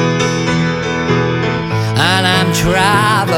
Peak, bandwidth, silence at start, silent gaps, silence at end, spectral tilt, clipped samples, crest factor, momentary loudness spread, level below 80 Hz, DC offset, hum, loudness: 0 dBFS; 17 kHz; 0 s; none; 0 s; -4.5 dB/octave; under 0.1%; 12 dB; 6 LU; -34 dBFS; under 0.1%; none; -13 LUFS